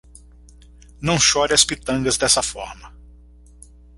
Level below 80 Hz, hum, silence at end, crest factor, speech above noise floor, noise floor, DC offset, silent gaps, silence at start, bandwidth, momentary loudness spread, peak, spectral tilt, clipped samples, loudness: -42 dBFS; 60 Hz at -40 dBFS; 1.1 s; 22 dB; 27 dB; -46 dBFS; under 0.1%; none; 1 s; 16 kHz; 13 LU; 0 dBFS; -2 dB/octave; under 0.1%; -17 LUFS